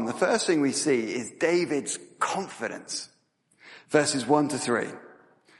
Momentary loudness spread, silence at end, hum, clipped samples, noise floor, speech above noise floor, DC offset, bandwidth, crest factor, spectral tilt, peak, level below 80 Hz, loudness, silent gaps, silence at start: 11 LU; 0.45 s; none; under 0.1%; -67 dBFS; 41 dB; under 0.1%; 11.5 kHz; 20 dB; -3.5 dB/octave; -6 dBFS; -74 dBFS; -26 LUFS; none; 0 s